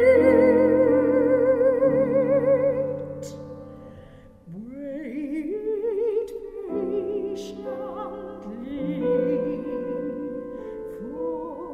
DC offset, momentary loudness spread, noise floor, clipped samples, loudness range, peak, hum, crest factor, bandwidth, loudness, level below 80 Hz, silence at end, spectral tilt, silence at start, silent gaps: under 0.1%; 18 LU; -47 dBFS; under 0.1%; 10 LU; -6 dBFS; none; 18 dB; 8.8 kHz; -23 LUFS; -54 dBFS; 0 s; -8 dB/octave; 0 s; none